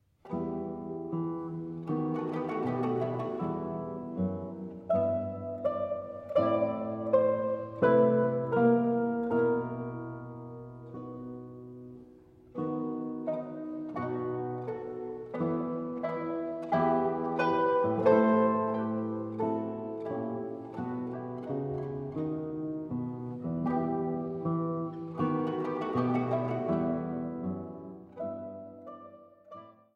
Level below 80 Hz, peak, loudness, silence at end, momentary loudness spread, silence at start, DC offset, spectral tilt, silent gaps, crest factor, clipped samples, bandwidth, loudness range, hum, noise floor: -66 dBFS; -12 dBFS; -32 LUFS; 0.25 s; 16 LU; 0.25 s; under 0.1%; -10 dB/octave; none; 20 dB; under 0.1%; 5.8 kHz; 9 LU; none; -55 dBFS